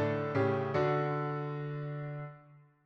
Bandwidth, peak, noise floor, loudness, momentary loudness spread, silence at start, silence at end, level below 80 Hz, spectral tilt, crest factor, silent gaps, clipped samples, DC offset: 6.6 kHz; -20 dBFS; -59 dBFS; -34 LUFS; 11 LU; 0 s; 0.25 s; -68 dBFS; -9 dB/octave; 14 dB; none; under 0.1%; under 0.1%